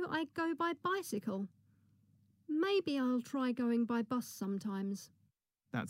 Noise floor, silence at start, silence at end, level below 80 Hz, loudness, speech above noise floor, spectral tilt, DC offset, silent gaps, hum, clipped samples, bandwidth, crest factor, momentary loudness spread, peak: -78 dBFS; 0 s; 0 s; -86 dBFS; -37 LUFS; 42 dB; -5.5 dB/octave; under 0.1%; none; none; under 0.1%; 16 kHz; 14 dB; 8 LU; -24 dBFS